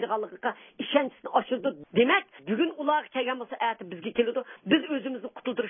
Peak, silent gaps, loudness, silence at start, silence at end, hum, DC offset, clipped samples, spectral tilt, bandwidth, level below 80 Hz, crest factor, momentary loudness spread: -8 dBFS; none; -28 LUFS; 0 s; 0 s; none; under 0.1%; under 0.1%; -9 dB/octave; 3.7 kHz; -74 dBFS; 20 dB; 9 LU